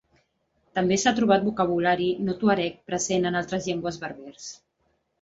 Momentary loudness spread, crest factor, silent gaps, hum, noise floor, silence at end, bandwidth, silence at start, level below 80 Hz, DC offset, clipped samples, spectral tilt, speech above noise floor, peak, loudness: 15 LU; 20 dB; none; none; -72 dBFS; 0.65 s; 8 kHz; 0.75 s; -58 dBFS; under 0.1%; under 0.1%; -4.5 dB/octave; 47 dB; -6 dBFS; -24 LUFS